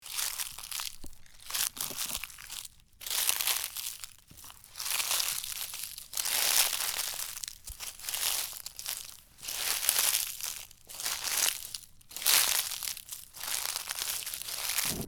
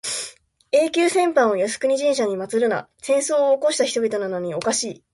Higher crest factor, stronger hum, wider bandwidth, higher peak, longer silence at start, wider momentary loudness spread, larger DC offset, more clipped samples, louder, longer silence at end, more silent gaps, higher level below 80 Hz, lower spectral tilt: first, 32 dB vs 16 dB; neither; first, over 20 kHz vs 11.5 kHz; first, -2 dBFS vs -6 dBFS; about the same, 0 s vs 0.05 s; first, 18 LU vs 8 LU; neither; neither; second, -30 LUFS vs -21 LUFS; second, 0 s vs 0.2 s; neither; first, -60 dBFS vs -66 dBFS; second, 1.5 dB/octave vs -3 dB/octave